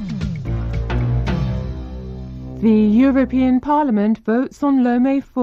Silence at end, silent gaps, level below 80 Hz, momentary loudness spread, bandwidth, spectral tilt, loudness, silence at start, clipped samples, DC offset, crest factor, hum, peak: 0 s; none; -30 dBFS; 16 LU; 7.4 kHz; -9 dB/octave; -18 LUFS; 0 s; under 0.1%; under 0.1%; 12 dB; none; -6 dBFS